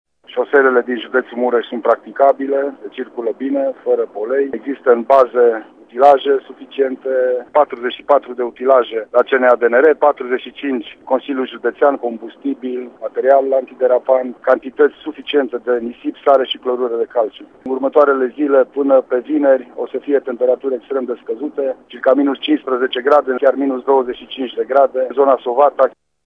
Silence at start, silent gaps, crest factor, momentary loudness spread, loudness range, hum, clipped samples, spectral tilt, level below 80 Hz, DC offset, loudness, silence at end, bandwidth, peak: 0.3 s; none; 16 dB; 11 LU; 3 LU; none; under 0.1%; -5.5 dB/octave; -66 dBFS; under 0.1%; -16 LUFS; 0.35 s; 5 kHz; 0 dBFS